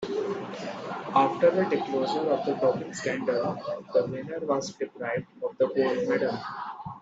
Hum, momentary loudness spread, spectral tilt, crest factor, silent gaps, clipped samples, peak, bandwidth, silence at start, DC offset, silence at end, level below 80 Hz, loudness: none; 12 LU; -5.5 dB/octave; 20 dB; none; under 0.1%; -8 dBFS; 8 kHz; 0 s; under 0.1%; 0 s; -70 dBFS; -28 LUFS